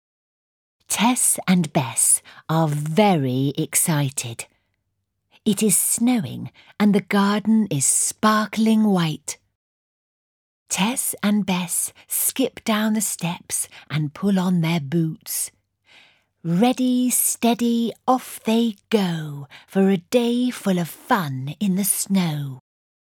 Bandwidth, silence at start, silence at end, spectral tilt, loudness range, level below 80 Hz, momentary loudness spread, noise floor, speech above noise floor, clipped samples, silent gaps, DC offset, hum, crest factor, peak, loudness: over 20 kHz; 0.9 s; 0.6 s; -4.5 dB/octave; 4 LU; -68 dBFS; 10 LU; -75 dBFS; 55 dB; under 0.1%; 9.55-10.66 s; under 0.1%; none; 18 dB; -4 dBFS; -20 LUFS